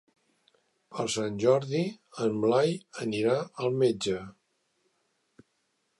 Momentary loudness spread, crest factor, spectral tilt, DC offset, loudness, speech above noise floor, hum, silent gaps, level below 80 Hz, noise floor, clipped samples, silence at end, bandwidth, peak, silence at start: 10 LU; 18 dB; -5.5 dB/octave; under 0.1%; -28 LUFS; 48 dB; none; none; -68 dBFS; -76 dBFS; under 0.1%; 1.7 s; 11.5 kHz; -12 dBFS; 0.9 s